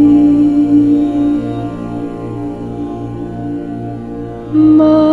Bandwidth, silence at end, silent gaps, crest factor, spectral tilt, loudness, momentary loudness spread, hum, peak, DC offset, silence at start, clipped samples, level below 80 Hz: 4.4 kHz; 0 s; none; 12 dB; -9.5 dB/octave; -13 LUFS; 15 LU; none; 0 dBFS; 0.1%; 0 s; under 0.1%; -38 dBFS